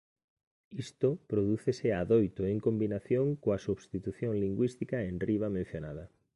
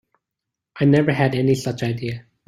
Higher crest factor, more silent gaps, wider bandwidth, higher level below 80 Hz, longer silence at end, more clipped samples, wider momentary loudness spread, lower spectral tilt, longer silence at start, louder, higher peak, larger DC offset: about the same, 18 dB vs 18 dB; neither; second, 11.5 kHz vs 13.5 kHz; about the same, -56 dBFS vs -54 dBFS; about the same, 0.3 s vs 0.25 s; neither; about the same, 12 LU vs 10 LU; first, -8.5 dB/octave vs -7 dB/octave; about the same, 0.7 s vs 0.75 s; second, -32 LUFS vs -20 LUFS; second, -14 dBFS vs -4 dBFS; neither